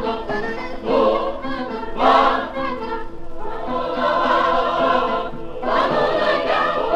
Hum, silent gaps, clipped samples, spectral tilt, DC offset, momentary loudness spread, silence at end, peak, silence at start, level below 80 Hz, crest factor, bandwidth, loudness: none; none; under 0.1%; -5.5 dB/octave; under 0.1%; 12 LU; 0 s; -2 dBFS; 0 s; -36 dBFS; 18 dB; 8.6 kHz; -20 LUFS